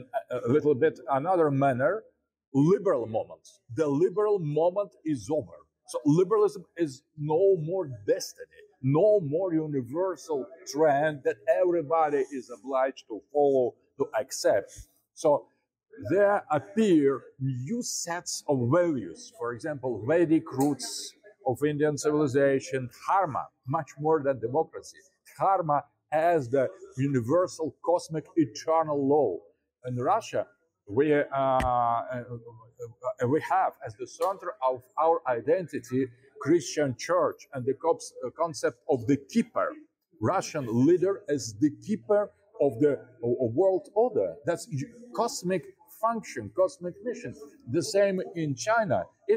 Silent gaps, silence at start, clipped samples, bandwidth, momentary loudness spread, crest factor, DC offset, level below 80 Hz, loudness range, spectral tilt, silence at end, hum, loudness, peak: 2.47-2.52 s; 0 s; under 0.1%; 16 kHz; 12 LU; 14 dB; under 0.1%; -62 dBFS; 2 LU; -6 dB/octave; 0 s; none; -28 LUFS; -12 dBFS